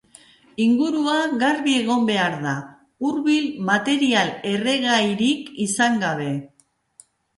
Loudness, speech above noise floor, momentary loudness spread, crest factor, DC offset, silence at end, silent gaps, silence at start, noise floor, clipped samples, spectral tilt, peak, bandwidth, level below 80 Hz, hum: -21 LUFS; 34 dB; 8 LU; 16 dB; under 0.1%; 0.9 s; none; 0.6 s; -54 dBFS; under 0.1%; -4 dB/octave; -6 dBFS; 11.5 kHz; -66 dBFS; none